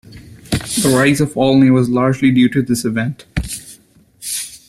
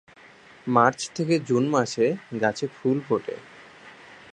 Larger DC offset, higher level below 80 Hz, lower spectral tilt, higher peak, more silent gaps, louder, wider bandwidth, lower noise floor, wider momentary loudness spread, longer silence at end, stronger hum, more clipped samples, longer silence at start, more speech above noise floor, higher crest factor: neither; first, -38 dBFS vs -68 dBFS; about the same, -5 dB/octave vs -5.5 dB/octave; about the same, -2 dBFS vs -4 dBFS; neither; first, -15 LUFS vs -24 LUFS; first, 15.5 kHz vs 11 kHz; second, -47 dBFS vs -51 dBFS; second, 12 LU vs 16 LU; about the same, 0.1 s vs 0.2 s; neither; neither; second, 0.1 s vs 0.65 s; first, 34 dB vs 27 dB; second, 14 dB vs 22 dB